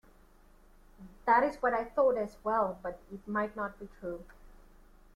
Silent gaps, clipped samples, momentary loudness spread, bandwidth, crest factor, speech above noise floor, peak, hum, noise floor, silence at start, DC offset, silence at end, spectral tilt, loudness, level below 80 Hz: none; under 0.1%; 15 LU; 14 kHz; 20 dB; 28 dB; -14 dBFS; none; -60 dBFS; 1 s; under 0.1%; 0.65 s; -7 dB/octave; -32 LUFS; -58 dBFS